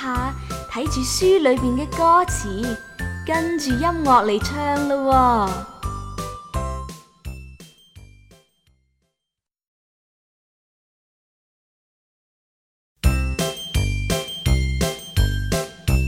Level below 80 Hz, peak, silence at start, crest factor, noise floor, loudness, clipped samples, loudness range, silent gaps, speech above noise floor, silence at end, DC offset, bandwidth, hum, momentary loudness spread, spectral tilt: -30 dBFS; -2 dBFS; 0 s; 20 dB; -85 dBFS; -21 LUFS; under 0.1%; 14 LU; 9.68-12.96 s; 66 dB; 0 s; under 0.1%; 16.5 kHz; none; 15 LU; -5 dB/octave